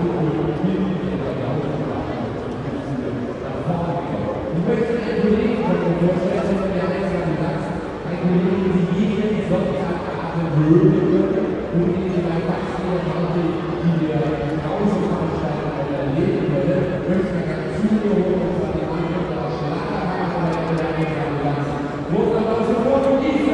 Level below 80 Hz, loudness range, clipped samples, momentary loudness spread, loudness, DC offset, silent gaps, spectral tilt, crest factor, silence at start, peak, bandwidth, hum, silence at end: -42 dBFS; 4 LU; under 0.1%; 6 LU; -21 LUFS; under 0.1%; none; -8.5 dB/octave; 18 dB; 0 s; -2 dBFS; 9.6 kHz; none; 0 s